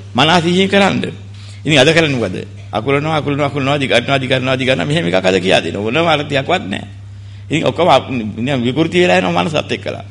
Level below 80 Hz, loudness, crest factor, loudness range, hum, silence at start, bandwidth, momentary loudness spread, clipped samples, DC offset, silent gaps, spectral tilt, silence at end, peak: -46 dBFS; -14 LUFS; 14 dB; 2 LU; none; 0 s; 11.5 kHz; 13 LU; under 0.1%; under 0.1%; none; -5 dB/octave; 0 s; 0 dBFS